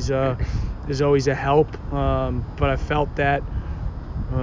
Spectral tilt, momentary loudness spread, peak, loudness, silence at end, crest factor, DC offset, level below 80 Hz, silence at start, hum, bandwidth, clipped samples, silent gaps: -7 dB/octave; 11 LU; -6 dBFS; -23 LUFS; 0 s; 16 dB; under 0.1%; -30 dBFS; 0 s; none; 7.6 kHz; under 0.1%; none